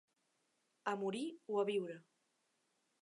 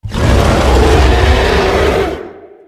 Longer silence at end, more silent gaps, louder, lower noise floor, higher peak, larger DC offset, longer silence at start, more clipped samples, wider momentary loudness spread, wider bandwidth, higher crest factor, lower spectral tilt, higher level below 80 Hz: first, 1 s vs 0.2 s; neither; second, -41 LUFS vs -11 LUFS; first, -82 dBFS vs -30 dBFS; second, -24 dBFS vs 0 dBFS; neither; first, 0.85 s vs 0.05 s; second, under 0.1% vs 0.4%; about the same, 10 LU vs 9 LU; second, 11 kHz vs 14.5 kHz; first, 20 dB vs 10 dB; about the same, -5.5 dB/octave vs -5.5 dB/octave; second, under -90 dBFS vs -14 dBFS